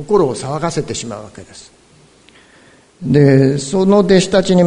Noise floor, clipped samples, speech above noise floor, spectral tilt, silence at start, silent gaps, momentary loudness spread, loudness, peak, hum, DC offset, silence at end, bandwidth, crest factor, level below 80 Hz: -48 dBFS; under 0.1%; 34 dB; -6 dB/octave; 0 s; none; 18 LU; -13 LUFS; 0 dBFS; none; under 0.1%; 0 s; 11 kHz; 14 dB; -46 dBFS